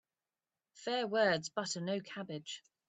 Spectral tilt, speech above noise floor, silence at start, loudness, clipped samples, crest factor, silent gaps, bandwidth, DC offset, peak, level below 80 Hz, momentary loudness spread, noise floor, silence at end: -3.5 dB/octave; over 54 dB; 0.75 s; -36 LUFS; under 0.1%; 20 dB; none; 9 kHz; under 0.1%; -18 dBFS; -82 dBFS; 13 LU; under -90 dBFS; 0.3 s